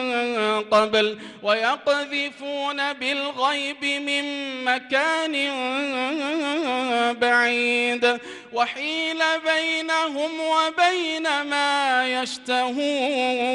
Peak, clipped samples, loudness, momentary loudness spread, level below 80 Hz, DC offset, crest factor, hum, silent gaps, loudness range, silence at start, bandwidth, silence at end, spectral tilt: -8 dBFS; under 0.1%; -22 LUFS; 6 LU; -70 dBFS; under 0.1%; 16 dB; none; none; 2 LU; 0 s; 11.5 kHz; 0 s; -2 dB/octave